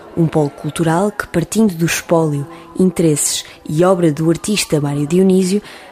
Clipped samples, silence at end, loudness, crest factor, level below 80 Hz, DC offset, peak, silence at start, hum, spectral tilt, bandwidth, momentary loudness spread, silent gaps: under 0.1%; 0 s; -15 LUFS; 14 dB; -46 dBFS; under 0.1%; 0 dBFS; 0 s; none; -5.5 dB/octave; 15.5 kHz; 7 LU; none